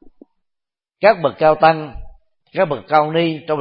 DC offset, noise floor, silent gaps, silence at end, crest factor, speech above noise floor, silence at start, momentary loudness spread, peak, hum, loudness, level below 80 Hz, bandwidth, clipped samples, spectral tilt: under 0.1%; -81 dBFS; none; 0 s; 18 dB; 66 dB; 1 s; 10 LU; 0 dBFS; none; -16 LUFS; -44 dBFS; 5.6 kHz; under 0.1%; -11 dB/octave